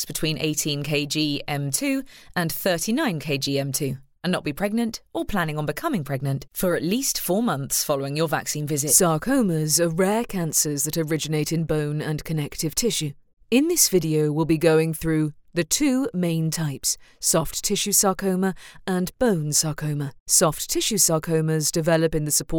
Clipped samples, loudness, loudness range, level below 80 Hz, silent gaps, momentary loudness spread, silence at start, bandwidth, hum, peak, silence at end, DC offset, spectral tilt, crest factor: under 0.1%; -23 LUFS; 4 LU; -46 dBFS; 13.33-13.37 s, 20.20-20.26 s; 9 LU; 0 s; over 20 kHz; none; -4 dBFS; 0 s; under 0.1%; -4 dB/octave; 20 dB